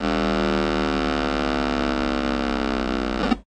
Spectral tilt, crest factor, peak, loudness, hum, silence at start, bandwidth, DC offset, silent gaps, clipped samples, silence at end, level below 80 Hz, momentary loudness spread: -5.5 dB/octave; 14 dB; -8 dBFS; -23 LUFS; none; 0 s; 9.8 kHz; under 0.1%; none; under 0.1%; 0.05 s; -34 dBFS; 2 LU